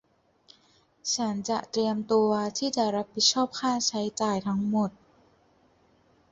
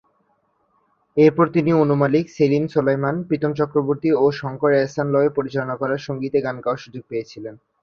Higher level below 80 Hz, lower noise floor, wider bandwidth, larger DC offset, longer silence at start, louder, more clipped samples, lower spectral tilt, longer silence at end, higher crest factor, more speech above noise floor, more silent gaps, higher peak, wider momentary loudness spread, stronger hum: second, -68 dBFS vs -60 dBFS; about the same, -64 dBFS vs -65 dBFS; first, 8 kHz vs 7 kHz; neither; about the same, 1.05 s vs 1.15 s; second, -27 LUFS vs -20 LUFS; neither; second, -3.5 dB/octave vs -8 dB/octave; first, 1.4 s vs 0.3 s; about the same, 20 dB vs 18 dB; second, 37 dB vs 46 dB; neither; second, -10 dBFS vs -2 dBFS; second, 6 LU vs 12 LU; neither